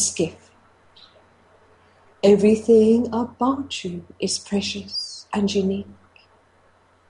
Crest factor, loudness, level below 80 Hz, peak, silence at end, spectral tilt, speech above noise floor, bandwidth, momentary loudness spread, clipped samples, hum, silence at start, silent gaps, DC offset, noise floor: 18 dB; -21 LUFS; -58 dBFS; -4 dBFS; 1.15 s; -4.5 dB/octave; 38 dB; 11.5 kHz; 14 LU; under 0.1%; none; 0 s; none; under 0.1%; -57 dBFS